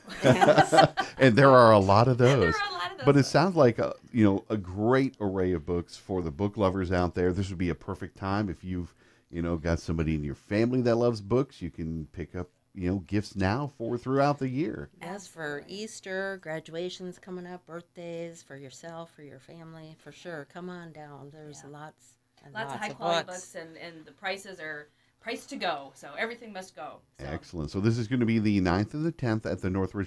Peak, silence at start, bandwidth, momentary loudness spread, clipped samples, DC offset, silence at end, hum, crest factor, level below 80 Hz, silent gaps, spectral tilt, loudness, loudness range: -4 dBFS; 0.05 s; 11 kHz; 22 LU; under 0.1%; under 0.1%; 0 s; none; 22 dB; -52 dBFS; none; -6.5 dB/octave; -27 LUFS; 21 LU